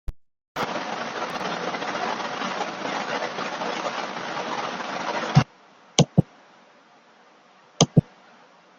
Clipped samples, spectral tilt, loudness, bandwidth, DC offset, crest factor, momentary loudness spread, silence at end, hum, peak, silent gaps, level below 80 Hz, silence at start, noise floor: under 0.1%; -4.5 dB/octave; -26 LUFS; 9.2 kHz; under 0.1%; 26 dB; 10 LU; 0.75 s; none; 0 dBFS; 0.48-0.55 s; -48 dBFS; 0.1 s; -54 dBFS